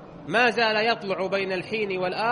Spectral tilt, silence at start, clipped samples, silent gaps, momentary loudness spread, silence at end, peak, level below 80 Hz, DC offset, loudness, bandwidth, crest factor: -4.5 dB/octave; 0 s; under 0.1%; none; 7 LU; 0 s; -8 dBFS; -62 dBFS; under 0.1%; -24 LUFS; 10.5 kHz; 16 dB